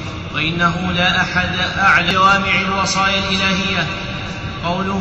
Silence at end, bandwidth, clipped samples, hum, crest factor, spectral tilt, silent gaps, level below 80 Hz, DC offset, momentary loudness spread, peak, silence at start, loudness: 0 s; 8.2 kHz; under 0.1%; none; 14 dB; -4 dB/octave; none; -36 dBFS; 0.1%; 11 LU; -2 dBFS; 0 s; -16 LUFS